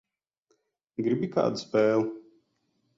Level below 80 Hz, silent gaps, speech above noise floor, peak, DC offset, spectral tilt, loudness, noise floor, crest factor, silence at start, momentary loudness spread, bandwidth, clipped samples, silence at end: -72 dBFS; none; 49 dB; -12 dBFS; under 0.1%; -6.5 dB/octave; -27 LUFS; -74 dBFS; 18 dB; 1 s; 14 LU; 7.8 kHz; under 0.1%; 0.75 s